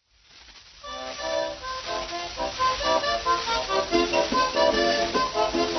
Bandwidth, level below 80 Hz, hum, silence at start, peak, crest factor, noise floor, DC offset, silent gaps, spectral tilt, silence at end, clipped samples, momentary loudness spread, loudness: 6.4 kHz; -48 dBFS; none; 0.35 s; -8 dBFS; 18 dB; -53 dBFS; under 0.1%; none; -2.5 dB/octave; 0 s; under 0.1%; 11 LU; -25 LUFS